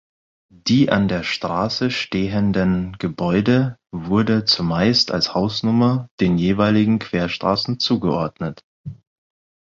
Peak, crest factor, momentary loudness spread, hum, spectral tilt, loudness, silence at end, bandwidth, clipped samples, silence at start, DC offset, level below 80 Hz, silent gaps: -2 dBFS; 18 dB; 10 LU; none; -6 dB/octave; -19 LUFS; 0.75 s; 7.6 kHz; under 0.1%; 0.65 s; under 0.1%; -46 dBFS; 6.11-6.18 s, 8.64-8.84 s